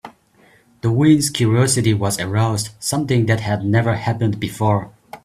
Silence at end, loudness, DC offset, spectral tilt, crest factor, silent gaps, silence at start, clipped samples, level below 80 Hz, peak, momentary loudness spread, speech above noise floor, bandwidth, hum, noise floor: 0.1 s; -18 LUFS; under 0.1%; -5.5 dB/octave; 16 dB; none; 0.05 s; under 0.1%; -50 dBFS; -2 dBFS; 7 LU; 36 dB; 14.5 kHz; none; -53 dBFS